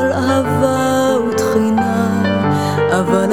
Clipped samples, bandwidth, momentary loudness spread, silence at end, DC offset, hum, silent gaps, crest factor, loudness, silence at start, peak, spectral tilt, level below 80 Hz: under 0.1%; 17 kHz; 1 LU; 0 s; 0.7%; none; none; 14 dB; -15 LUFS; 0 s; 0 dBFS; -6 dB/octave; -48 dBFS